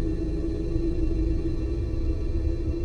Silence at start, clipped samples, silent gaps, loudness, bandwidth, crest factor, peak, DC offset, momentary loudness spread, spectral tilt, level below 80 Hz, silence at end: 0 s; under 0.1%; none; -29 LUFS; 6.8 kHz; 14 dB; -12 dBFS; under 0.1%; 2 LU; -9 dB/octave; -28 dBFS; 0 s